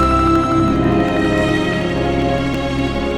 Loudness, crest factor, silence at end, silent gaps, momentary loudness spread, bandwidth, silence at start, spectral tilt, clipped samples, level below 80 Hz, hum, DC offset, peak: -16 LUFS; 12 dB; 0 s; none; 5 LU; 12.5 kHz; 0 s; -6.5 dB/octave; under 0.1%; -28 dBFS; none; under 0.1%; -4 dBFS